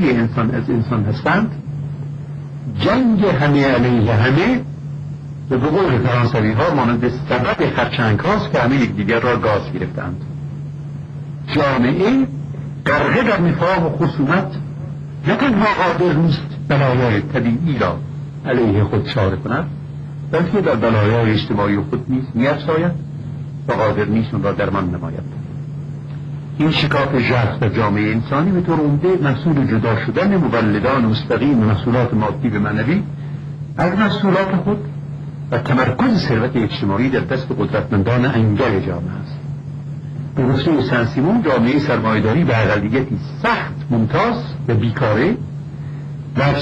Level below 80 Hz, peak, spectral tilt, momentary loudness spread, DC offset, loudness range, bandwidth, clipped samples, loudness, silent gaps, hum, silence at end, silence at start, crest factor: -42 dBFS; -4 dBFS; -8 dB/octave; 13 LU; under 0.1%; 3 LU; 8 kHz; under 0.1%; -17 LUFS; none; none; 0 s; 0 s; 12 dB